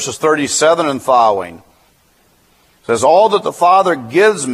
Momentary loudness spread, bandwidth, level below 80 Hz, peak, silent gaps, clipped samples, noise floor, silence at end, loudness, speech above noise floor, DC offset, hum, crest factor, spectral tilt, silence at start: 9 LU; 15.5 kHz; -58 dBFS; 0 dBFS; none; under 0.1%; -54 dBFS; 0 s; -12 LUFS; 41 dB; under 0.1%; none; 14 dB; -3 dB/octave; 0 s